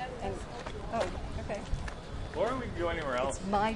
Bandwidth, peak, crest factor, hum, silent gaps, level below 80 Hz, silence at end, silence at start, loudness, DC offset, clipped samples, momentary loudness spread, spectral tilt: 11.5 kHz; -16 dBFS; 18 dB; none; none; -42 dBFS; 0 s; 0 s; -35 LUFS; under 0.1%; under 0.1%; 9 LU; -5.5 dB/octave